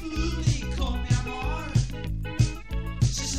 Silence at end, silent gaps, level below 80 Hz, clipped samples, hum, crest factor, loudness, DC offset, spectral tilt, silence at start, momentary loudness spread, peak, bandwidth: 0 s; none; -32 dBFS; under 0.1%; none; 18 dB; -28 LUFS; 0.8%; -5 dB/octave; 0 s; 6 LU; -8 dBFS; 13.5 kHz